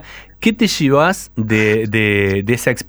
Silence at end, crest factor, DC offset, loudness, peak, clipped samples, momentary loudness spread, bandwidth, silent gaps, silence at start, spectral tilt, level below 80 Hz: 0.05 s; 16 dB; under 0.1%; -15 LUFS; 0 dBFS; under 0.1%; 5 LU; over 20 kHz; none; 0 s; -5 dB/octave; -44 dBFS